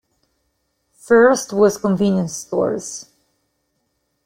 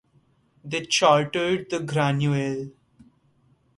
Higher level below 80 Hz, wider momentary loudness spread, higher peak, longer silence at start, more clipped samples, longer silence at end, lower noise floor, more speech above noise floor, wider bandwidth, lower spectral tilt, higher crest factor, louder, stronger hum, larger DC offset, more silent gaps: about the same, -58 dBFS vs -62 dBFS; about the same, 14 LU vs 12 LU; first, -2 dBFS vs -6 dBFS; first, 1.1 s vs 0.65 s; neither; first, 1.25 s vs 1.05 s; first, -70 dBFS vs -63 dBFS; first, 54 dB vs 40 dB; first, 16 kHz vs 11.5 kHz; about the same, -5.5 dB/octave vs -4.5 dB/octave; about the same, 18 dB vs 20 dB; first, -17 LUFS vs -23 LUFS; neither; neither; neither